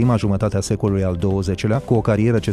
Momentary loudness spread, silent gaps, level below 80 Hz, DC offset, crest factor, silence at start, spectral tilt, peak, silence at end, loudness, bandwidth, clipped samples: 3 LU; none; -38 dBFS; under 0.1%; 14 dB; 0 s; -7 dB/octave; -4 dBFS; 0 s; -19 LUFS; 12.5 kHz; under 0.1%